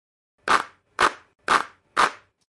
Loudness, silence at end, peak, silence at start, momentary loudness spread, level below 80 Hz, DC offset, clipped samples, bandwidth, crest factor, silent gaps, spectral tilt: -23 LUFS; 0.35 s; -4 dBFS; 0.45 s; 12 LU; -58 dBFS; under 0.1%; under 0.1%; 11.5 kHz; 22 dB; none; -1.5 dB/octave